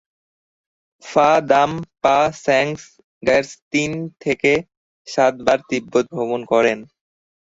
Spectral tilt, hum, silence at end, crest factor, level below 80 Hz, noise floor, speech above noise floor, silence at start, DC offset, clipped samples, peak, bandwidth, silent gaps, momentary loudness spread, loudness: -4.5 dB/octave; none; 0.7 s; 18 dB; -56 dBFS; under -90 dBFS; over 72 dB; 1.05 s; under 0.1%; under 0.1%; 0 dBFS; 8 kHz; 3.04-3.21 s, 3.62-3.71 s, 4.77-5.05 s; 9 LU; -18 LUFS